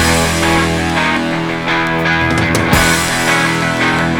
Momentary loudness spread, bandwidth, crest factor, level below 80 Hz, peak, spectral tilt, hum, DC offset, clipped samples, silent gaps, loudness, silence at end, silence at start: 4 LU; over 20 kHz; 14 dB; -30 dBFS; 0 dBFS; -4 dB/octave; none; under 0.1%; under 0.1%; none; -13 LUFS; 0 s; 0 s